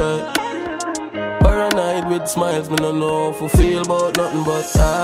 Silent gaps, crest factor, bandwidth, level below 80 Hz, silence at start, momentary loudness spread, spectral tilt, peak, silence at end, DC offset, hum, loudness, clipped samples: none; 16 dB; 16 kHz; -24 dBFS; 0 s; 9 LU; -5 dB/octave; -2 dBFS; 0 s; under 0.1%; none; -19 LUFS; under 0.1%